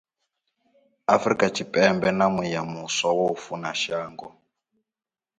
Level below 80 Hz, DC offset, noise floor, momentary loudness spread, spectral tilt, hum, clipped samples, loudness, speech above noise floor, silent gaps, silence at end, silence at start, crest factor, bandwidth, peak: -62 dBFS; under 0.1%; under -90 dBFS; 11 LU; -4 dB/octave; none; under 0.1%; -24 LUFS; over 66 dB; none; 1.1 s; 1.1 s; 22 dB; 9.4 kHz; -4 dBFS